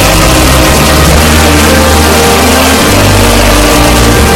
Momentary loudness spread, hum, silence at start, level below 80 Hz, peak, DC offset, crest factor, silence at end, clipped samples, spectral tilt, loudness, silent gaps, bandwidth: 0 LU; none; 0 s; -12 dBFS; 0 dBFS; under 0.1%; 4 dB; 0 s; 6%; -4 dB/octave; -4 LUFS; none; over 20 kHz